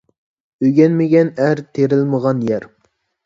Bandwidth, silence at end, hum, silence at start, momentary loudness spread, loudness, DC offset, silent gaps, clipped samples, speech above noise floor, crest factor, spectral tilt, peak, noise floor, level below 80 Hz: 7.6 kHz; 0.6 s; none; 0.6 s; 7 LU; -16 LUFS; under 0.1%; none; under 0.1%; 50 dB; 16 dB; -9 dB/octave; 0 dBFS; -64 dBFS; -60 dBFS